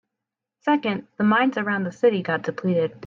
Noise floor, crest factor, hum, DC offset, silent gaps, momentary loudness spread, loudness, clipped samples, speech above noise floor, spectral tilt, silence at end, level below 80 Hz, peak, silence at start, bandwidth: -85 dBFS; 16 dB; none; under 0.1%; none; 6 LU; -23 LUFS; under 0.1%; 63 dB; -7.5 dB/octave; 0 s; -68 dBFS; -8 dBFS; 0.65 s; 7.4 kHz